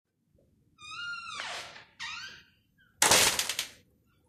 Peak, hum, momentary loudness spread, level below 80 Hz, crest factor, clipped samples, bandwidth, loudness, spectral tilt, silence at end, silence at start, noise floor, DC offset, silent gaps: -4 dBFS; none; 21 LU; -64 dBFS; 30 dB; under 0.1%; 14.5 kHz; -27 LUFS; 0 dB/octave; 0.55 s; 0.8 s; -69 dBFS; under 0.1%; none